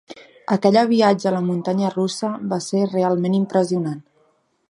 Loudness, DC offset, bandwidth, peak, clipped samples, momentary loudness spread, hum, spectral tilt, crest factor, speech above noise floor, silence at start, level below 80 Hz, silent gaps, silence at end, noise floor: -20 LUFS; under 0.1%; 11 kHz; -2 dBFS; under 0.1%; 9 LU; none; -6.5 dB/octave; 18 dB; 44 dB; 0.1 s; -68 dBFS; none; 0.7 s; -63 dBFS